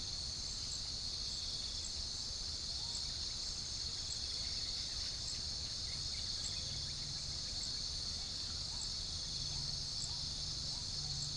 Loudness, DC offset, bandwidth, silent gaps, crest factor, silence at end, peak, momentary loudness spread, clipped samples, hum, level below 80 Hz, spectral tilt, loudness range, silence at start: -39 LUFS; under 0.1%; 10.5 kHz; none; 14 dB; 0 s; -28 dBFS; 2 LU; under 0.1%; none; -52 dBFS; -1.5 dB/octave; 0 LU; 0 s